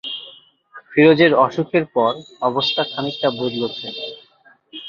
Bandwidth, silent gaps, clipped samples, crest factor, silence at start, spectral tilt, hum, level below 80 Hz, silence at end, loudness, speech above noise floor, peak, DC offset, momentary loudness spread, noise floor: 7.2 kHz; none; under 0.1%; 18 dB; 0.05 s; -6.5 dB/octave; none; -62 dBFS; 0 s; -18 LUFS; 36 dB; -2 dBFS; under 0.1%; 16 LU; -54 dBFS